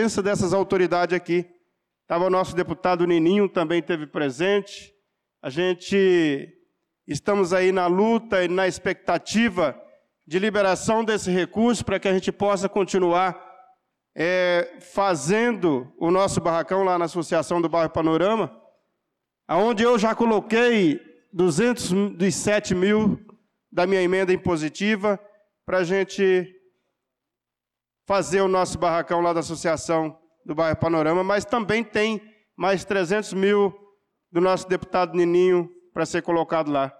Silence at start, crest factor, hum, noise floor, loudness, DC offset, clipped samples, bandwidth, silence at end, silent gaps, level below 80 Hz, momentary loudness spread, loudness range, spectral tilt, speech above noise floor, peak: 0 s; 10 dB; none; -87 dBFS; -22 LUFS; under 0.1%; under 0.1%; 12.5 kHz; 0.1 s; none; -56 dBFS; 7 LU; 3 LU; -5 dB/octave; 66 dB; -12 dBFS